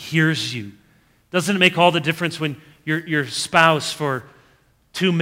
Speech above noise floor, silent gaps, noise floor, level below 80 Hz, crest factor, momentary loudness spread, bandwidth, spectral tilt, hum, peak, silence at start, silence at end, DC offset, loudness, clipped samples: 38 dB; none; -58 dBFS; -62 dBFS; 20 dB; 14 LU; 16 kHz; -4.5 dB/octave; none; 0 dBFS; 0 s; 0 s; under 0.1%; -19 LUFS; under 0.1%